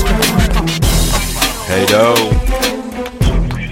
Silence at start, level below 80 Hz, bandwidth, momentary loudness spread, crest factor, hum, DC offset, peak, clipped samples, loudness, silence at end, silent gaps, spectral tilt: 0 s; -18 dBFS; 17 kHz; 7 LU; 12 dB; none; under 0.1%; 0 dBFS; under 0.1%; -14 LUFS; 0 s; none; -4 dB/octave